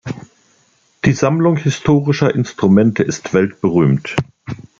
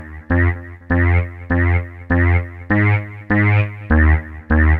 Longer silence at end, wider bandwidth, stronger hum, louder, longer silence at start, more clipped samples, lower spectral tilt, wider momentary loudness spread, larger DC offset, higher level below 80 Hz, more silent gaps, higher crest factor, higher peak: first, 0.25 s vs 0 s; first, 7.6 kHz vs 3.8 kHz; neither; about the same, -15 LUFS vs -17 LUFS; about the same, 0.05 s vs 0 s; neither; second, -7 dB/octave vs -10.5 dB/octave; first, 12 LU vs 6 LU; neither; second, -46 dBFS vs -26 dBFS; neither; about the same, 14 dB vs 14 dB; about the same, -2 dBFS vs -2 dBFS